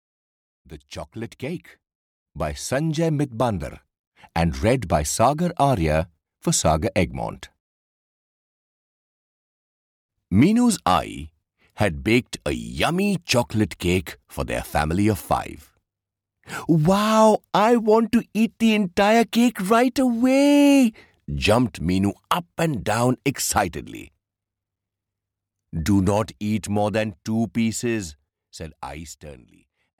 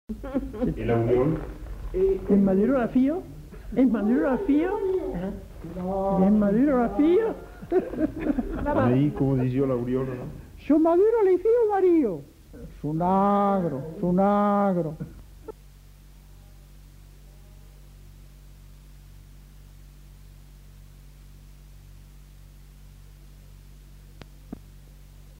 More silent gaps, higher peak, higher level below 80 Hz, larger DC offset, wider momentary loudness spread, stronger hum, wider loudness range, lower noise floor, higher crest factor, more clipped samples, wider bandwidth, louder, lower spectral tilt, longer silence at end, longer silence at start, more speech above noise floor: first, 1.95-2.26 s, 3.99-4.12 s, 7.60-10.09 s vs none; first, -6 dBFS vs -10 dBFS; about the same, -42 dBFS vs -44 dBFS; neither; about the same, 18 LU vs 19 LU; neither; first, 8 LU vs 4 LU; first, -86 dBFS vs -49 dBFS; about the same, 16 dB vs 16 dB; neither; first, 18 kHz vs 16 kHz; first, -21 LUFS vs -24 LUFS; second, -5.5 dB/octave vs -9.5 dB/octave; first, 0.65 s vs 0.05 s; first, 0.7 s vs 0.1 s; first, 65 dB vs 26 dB